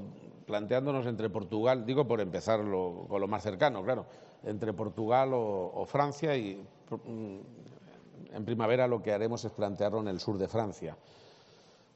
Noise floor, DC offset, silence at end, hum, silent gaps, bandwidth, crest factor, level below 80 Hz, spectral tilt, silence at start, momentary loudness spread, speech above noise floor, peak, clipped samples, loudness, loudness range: -60 dBFS; under 0.1%; 0.65 s; none; none; 8 kHz; 20 dB; -74 dBFS; -5.5 dB/octave; 0 s; 16 LU; 28 dB; -12 dBFS; under 0.1%; -32 LUFS; 3 LU